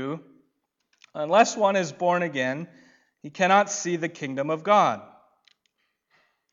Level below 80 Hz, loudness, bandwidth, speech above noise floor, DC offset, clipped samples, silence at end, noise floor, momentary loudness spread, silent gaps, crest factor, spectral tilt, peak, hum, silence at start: -80 dBFS; -23 LUFS; 7.8 kHz; 51 dB; under 0.1%; under 0.1%; 1.5 s; -74 dBFS; 18 LU; none; 20 dB; -4 dB/octave; -6 dBFS; none; 0 s